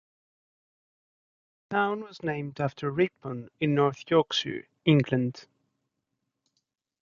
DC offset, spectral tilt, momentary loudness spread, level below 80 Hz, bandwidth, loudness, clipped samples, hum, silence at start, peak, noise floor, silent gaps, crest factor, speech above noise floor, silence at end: under 0.1%; -6.5 dB/octave; 10 LU; -66 dBFS; 7.2 kHz; -28 LUFS; under 0.1%; none; 1.7 s; -8 dBFS; -82 dBFS; none; 22 dB; 55 dB; 1.6 s